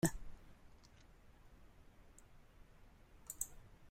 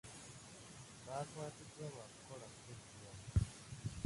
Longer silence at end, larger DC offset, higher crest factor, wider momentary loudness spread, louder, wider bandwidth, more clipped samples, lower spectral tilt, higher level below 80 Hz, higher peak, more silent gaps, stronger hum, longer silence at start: about the same, 0 s vs 0 s; neither; first, 30 dB vs 24 dB; first, 21 LU vs 15 LU; about the same, -47 LUFS vs -48 LUFS; first, 16 kHz vs 11.5 kHz; neither; about the same, -4.5 dB/octave vs -5 dB/octave; second, -60 dBFS vs -54 dBFS; about the same, -20 dBFS vs -22 dBFS; neither; neither; about the same, 0 s vs 0.05 s